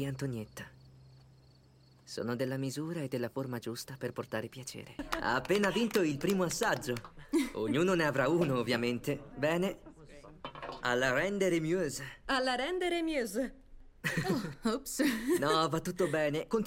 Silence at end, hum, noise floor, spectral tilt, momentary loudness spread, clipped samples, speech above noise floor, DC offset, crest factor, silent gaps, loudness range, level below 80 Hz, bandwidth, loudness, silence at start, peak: 0 s; none; -62 dBFS; -5 dB/octave; 12 LU; under 0.1%; 29 dB; under 0.1%; 18 dB; none; 7 LU; -58 dBFS; 16.5 kHz; -33 LUFS; 0 s; -16 dBFS